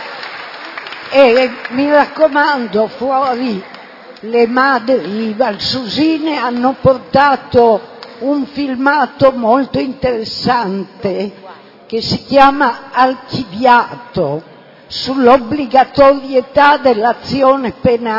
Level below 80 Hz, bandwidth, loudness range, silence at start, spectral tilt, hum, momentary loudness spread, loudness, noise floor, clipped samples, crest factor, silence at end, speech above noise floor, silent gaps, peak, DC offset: -46 dBFS; 6 kHz; 3 LU; 0 s; -6 dB/octave; none; 13 LU; -13 LUFS; -34 dBFS; 0.3%; 14 dB; 0 s; 22 dB; none; 0 dBFS; under 0.1%